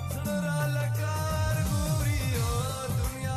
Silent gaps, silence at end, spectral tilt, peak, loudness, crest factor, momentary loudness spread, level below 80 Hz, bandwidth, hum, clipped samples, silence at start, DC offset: none; 0 s; -5.5 dB/octave; -18 dBFS; -29 LUFS; 10 dB; 3 LU; -38 dBFS; 14 kHz; none; under 0.1%; 0 s; under 0.1%